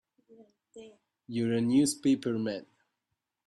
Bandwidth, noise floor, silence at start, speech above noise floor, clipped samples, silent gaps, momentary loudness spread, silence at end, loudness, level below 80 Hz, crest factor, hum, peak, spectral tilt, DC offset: 13 kHz; -85 dBFS; 0.75 s; 55 dB; under 0.1%; none; 12 LU; 0.85 s; -29 LUFS; -72 dBFS; 18 dB; none; -14 dBFS; -5 dB/octave; under 0.1%